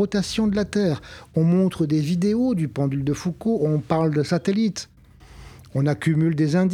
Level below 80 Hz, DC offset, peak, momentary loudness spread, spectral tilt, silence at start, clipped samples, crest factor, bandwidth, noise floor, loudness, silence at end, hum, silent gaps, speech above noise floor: -50 dBFS; under 0.1%; -6 dBFS; 5 LU; -7 dB/octave; 0 s; under 0.1%; 14 dB; 13 kHz; -46 dBFS; -22 LUFS; 0 s; none; none; 25 dB